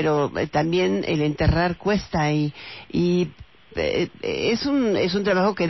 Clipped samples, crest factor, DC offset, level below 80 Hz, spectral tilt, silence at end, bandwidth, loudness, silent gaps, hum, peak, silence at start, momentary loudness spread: under 0.1%; 14 dB; 0.2%; -40 dBFS; -6.5 dB/octave; 0 s; 6.2 kHz; -23 LUFS; none; none; -8 dBFS; 0 s; 6 LU